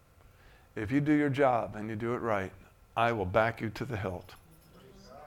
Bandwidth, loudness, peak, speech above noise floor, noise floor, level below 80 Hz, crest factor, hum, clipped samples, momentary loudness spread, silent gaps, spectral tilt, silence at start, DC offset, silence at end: 16 kHz; -31 LUFS; -10 dBFS; 28 dB; -58 dBFS; -58 dBFS; 22 dB; none; under 0.1%; 12 LU; none; -7.5 dB/octave; 0.75 s; under 0.1%; 0 s